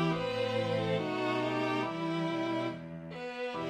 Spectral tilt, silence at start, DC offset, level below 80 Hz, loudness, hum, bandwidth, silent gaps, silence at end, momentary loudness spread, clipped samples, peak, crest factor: -6.5 dB/octave; 0 s; under 0.1%; -66 dBFS; -33 LUFS; none; 11.5 kHz; none; 0 s; 9 LU; under 0.1%; -20 dBFS; 14 dB